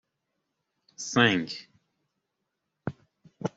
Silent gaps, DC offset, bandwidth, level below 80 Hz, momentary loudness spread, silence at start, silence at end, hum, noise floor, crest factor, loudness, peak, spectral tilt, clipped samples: none; under 0.1%; 8 kHz; -70 dBFS; 17 LU; 1 s; 0.1 s; none; -82 dBFS; 26 dB; -26 LUFS; -6 dBFS; -4 dB/octave; under 0.1%